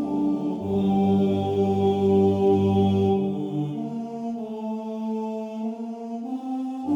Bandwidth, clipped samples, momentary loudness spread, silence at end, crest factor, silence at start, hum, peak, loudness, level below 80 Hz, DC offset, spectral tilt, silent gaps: 7.6 kHz; under 0.1%; 11 LU; 0 s; 14 dB; 0 s; none; -10 dBFS; -24 LUFS; -62 dBFS; under 0.1%; -9.5 dB/octave; none